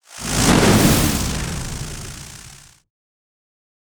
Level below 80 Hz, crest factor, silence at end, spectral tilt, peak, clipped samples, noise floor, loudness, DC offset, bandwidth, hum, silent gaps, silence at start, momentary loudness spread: -32 dBFS; 20 dB; 1.3 s; -4 dB/octave; -2 dBFS; under 0.1%; -43 dBFS; -17 LUFS; under 0.1%; over 20 kHz; none; none; 0.1 s; 21 LU